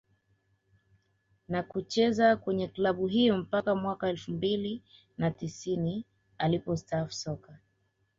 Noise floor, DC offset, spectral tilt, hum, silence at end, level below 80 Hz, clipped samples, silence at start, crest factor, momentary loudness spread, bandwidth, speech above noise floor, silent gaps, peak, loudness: -74 dBFS; under 0.1%; -6 dB/octave; none; 0.6 s; -62 dBFS; under 0.1%; 1.5 s; 18 dB; 12 LU; 7.8 kHz; 45 dB; none; -12 dBFS; -30 LUFS